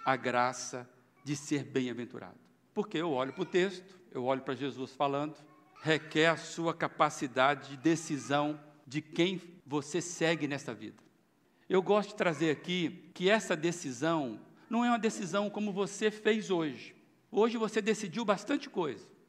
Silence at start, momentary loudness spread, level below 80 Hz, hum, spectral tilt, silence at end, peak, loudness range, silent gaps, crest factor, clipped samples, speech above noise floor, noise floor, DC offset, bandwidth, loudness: 0 s; 12 LU; -84 dBFS; none; -4.5 dB/octave; 0.25 s; -12 dBFS; 4 LU; none; 22 dB; under 0.1%; 37 dB; -69 dBFS; under 0.1%; 13.5 kHz; -33 LUFS